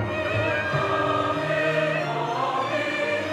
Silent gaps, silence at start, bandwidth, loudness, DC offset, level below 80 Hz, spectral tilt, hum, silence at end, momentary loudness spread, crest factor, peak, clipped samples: none; 0 s; 13 kHz; -24 LUFS; under 0.1%; -56 dBFS; -5.5 dB/octave; none; 0 s; 3 LU; 14 dB; -12 dBFS; under 0.1%